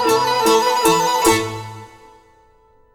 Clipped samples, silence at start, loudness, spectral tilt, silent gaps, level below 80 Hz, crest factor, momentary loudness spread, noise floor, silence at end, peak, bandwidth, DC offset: under 0.1%; 0 s; -16 LUFS; -3 dB/octave; none; -48 dBFS; 16 dB; 14 LU; -53 dBFS; 1.05 s; -2 dBFS; over 20 kHz; under 0.1%